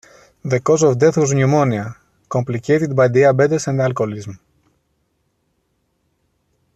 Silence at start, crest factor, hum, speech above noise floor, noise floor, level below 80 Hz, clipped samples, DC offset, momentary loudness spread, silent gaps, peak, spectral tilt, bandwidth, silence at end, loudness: 0.45 s; 16 dB; none; 52 dB; -67 dBFS; -56 dBFS; under 0.1%; under 0.1%; 12 LU; none; -2 dBFS; -6.5 dB/octave; 8.8 kHz; 2.4 s; -16 LUFS